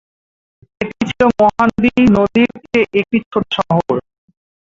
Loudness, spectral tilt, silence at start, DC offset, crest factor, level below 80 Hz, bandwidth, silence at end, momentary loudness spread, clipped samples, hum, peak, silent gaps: -15 LUFS; -7 dB/octave; 0.8 s; under 0.1%; 14 dB; -44 dBFS; 7.6 kHz; 0.65 s; 9 LU; under 0.1%; none; 0 dBFS; 3.26-3.31 s